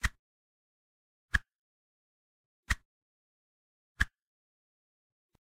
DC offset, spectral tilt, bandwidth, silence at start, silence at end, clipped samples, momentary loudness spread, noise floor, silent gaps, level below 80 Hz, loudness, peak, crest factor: under 0.1%; -3 dB/octave; 15.5 kHz; 0.05 s; 1.35 s; under 0.1%; 3 LU; under -90 dBFS; 0.19-1.28 s, 1.55-2.63 s, 2.85-3.95 s; -46 dBFS; -35 LUFS; -10 dBFS; 30 dB